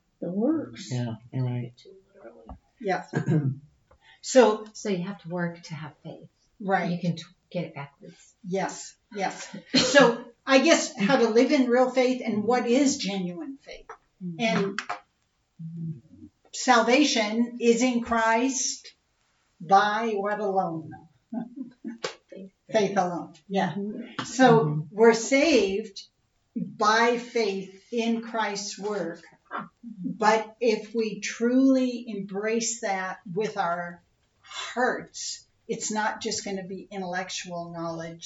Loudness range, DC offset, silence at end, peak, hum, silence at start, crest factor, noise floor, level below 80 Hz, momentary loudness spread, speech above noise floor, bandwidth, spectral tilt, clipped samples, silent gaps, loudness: 9 LU; under 0.1%; 0 s; -4 dBFS; none; 0.2 s; 22 dB; -72 dBFS; -66 dBFS; 19 LU; 47 dB; 8 kHz; -4.5 dB/octave; under 0.1%; none; -25 LUFS